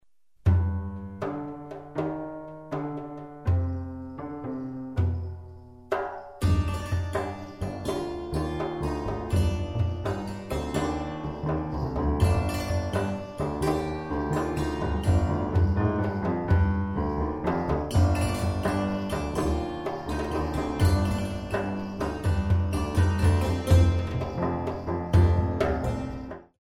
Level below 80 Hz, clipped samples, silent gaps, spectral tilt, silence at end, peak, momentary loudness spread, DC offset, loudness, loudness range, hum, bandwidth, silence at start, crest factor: -36 dBFS; under 0.1%; none; -7.5 dB/octave; 0.15 s; -8 dBFS; 11 LU; 0.1%; -28 LUFS; 7 LU; none; 13 kHz; 0.45 s; 18 dB